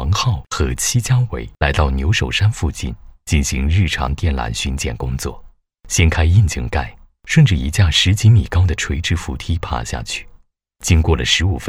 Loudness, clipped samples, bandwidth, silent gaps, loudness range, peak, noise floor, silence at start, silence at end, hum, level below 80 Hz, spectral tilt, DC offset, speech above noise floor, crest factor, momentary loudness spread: -17 LUFS; under 0.1%; 14.5 kHz; none; 4 LU; -2 dBFS; -48 dBFS; 0 s; 0 s; none; -24 dBFS; -4.5 dB/octave; under 0.1%; 32 dB; 16 dB; 11 LU